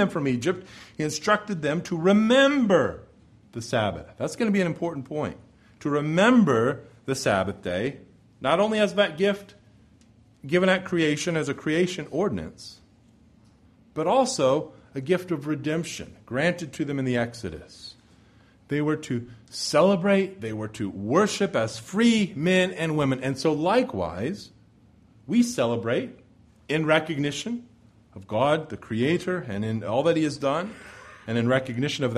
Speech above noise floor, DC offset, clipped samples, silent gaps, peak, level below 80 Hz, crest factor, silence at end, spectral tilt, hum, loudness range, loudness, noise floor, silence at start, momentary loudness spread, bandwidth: 32 dB; under 0.1%; under 0.1%; none; -6 dBFS; -58 dBFS; 20 dB; 0 s; -5.5 dB/octave; none; 5 LU; -25 LUFS; -57 dBFS; 0 s; 14 LU; 13.5 kHz